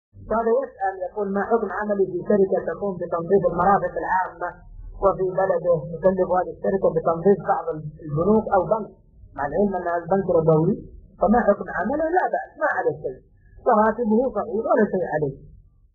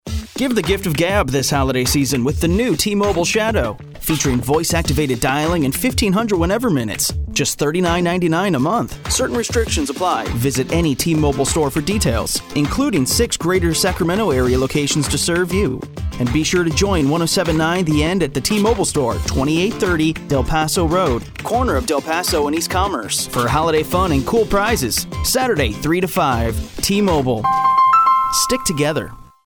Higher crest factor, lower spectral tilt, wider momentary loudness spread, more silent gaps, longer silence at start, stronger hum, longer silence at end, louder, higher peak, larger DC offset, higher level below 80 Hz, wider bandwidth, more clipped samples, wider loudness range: about the same, 18 dB vs 14 dB; first, -11.5 dB/octave vs -4.5 dB/octave; first, 9 LU vs 4 LU; neither; about the same, 0.15 s vs 0.05 s; neither; first, 0.4 s vs 0.25 s; second, -22 LUFS vs -17 LUFS; about the same, -4 dBFS vs -2 dBFS; neither; second, -48 dBFS vs -30 dBFS; second, 2 kHz vs over 20 kHz; neither; about the same, 1 LU vs 2 LU